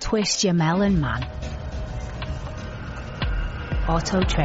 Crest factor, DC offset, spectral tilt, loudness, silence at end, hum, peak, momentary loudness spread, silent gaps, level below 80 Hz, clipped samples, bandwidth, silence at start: 14 dB; under 0.1%; -5 dB/octave; -25 LUFS; 0 s; none; -10 dBFS; 14 LU; none; -30 dBFS; under 0.1%; 8 kHz; 0 s